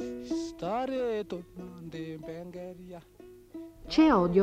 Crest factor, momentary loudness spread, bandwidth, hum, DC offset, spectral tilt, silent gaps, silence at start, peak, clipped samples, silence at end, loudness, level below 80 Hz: 18 dB; 23 LU; 9 kHz; none; under 0.1%; -6.5 dB/octave; none; 0 s; -12 dBFS; under 0.1%; 0 s; -30 LUFS; -54 dBFS